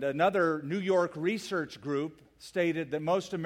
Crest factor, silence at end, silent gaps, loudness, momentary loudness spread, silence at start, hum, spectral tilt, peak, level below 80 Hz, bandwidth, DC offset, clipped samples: 18 dB; 0 s; none; -31 LUFS; 8 LU; 0 s; none; -6 dB/octave; -12 dBFS; -70 dBFS; 15.5 kHz; under 0.1%; under 0.1%